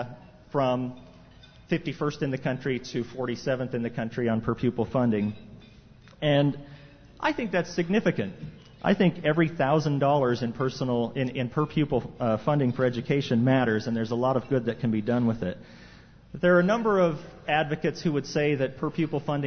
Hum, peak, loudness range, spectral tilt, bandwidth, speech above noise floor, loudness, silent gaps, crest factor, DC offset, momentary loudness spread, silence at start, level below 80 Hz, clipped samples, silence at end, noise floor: none; -10 dBFS; 4 LU; -7 dB/octave; 6.6 kHz; 26 dB; -27 LUFS; none; 18 dB; under 0.1%; 8 LU; 0 s; -56 dBFS; under 0.1%; 0 s; -52 dBFS